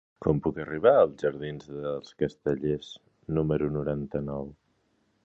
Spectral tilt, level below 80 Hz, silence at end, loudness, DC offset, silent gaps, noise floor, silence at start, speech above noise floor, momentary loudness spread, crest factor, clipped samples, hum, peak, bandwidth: -8.5 dB/octave; -52 dBFS; 0.7 s; -28 LUFS; under 0.1%; none; -71 dBFS; 0.2 s; 43 dB; 15 LU; 20 dB; under 0.1%; none; -8 dBFS; 7.8 kHz